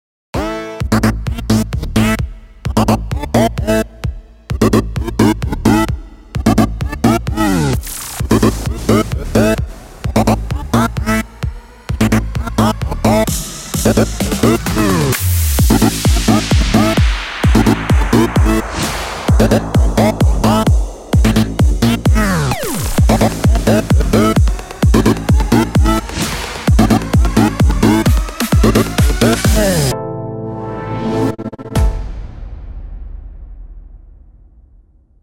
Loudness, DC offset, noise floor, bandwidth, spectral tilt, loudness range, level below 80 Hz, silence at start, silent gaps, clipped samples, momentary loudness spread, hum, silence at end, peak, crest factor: -14 LUFS; under 0.1%; -47 dBFS; 16.5 kHz; -5.5 dB/octave; 4 LU; -20 dBFS; 0.35 s; none; under 0.1%; 12 LU; none; 1.15 s; 0 dBFS; 14 dB